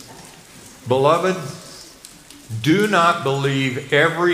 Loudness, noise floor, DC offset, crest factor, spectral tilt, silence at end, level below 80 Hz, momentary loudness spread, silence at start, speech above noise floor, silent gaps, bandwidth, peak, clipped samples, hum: -18 LUFS; -43 dBFS; under 0.1%; 18 dB; -5 dB/octave; 0 s; -58 dBFS; 22 LU; 0 s; 25 dB; none; 15.5 kHz; -2 dBFS; under 0.1%; none